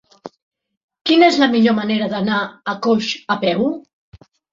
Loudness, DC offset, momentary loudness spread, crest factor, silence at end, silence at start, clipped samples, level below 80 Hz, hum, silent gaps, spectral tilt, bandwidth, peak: -17 LUFS; under 0.1%; 10 LU; 16 dB; 0.75 s; 0.25 s; under 0.1%; -60 dBFS; none; 0.42-0.51 s, 0.77-0.88 s; -5 dB/octave; 7.6 kHz; -2 dBFS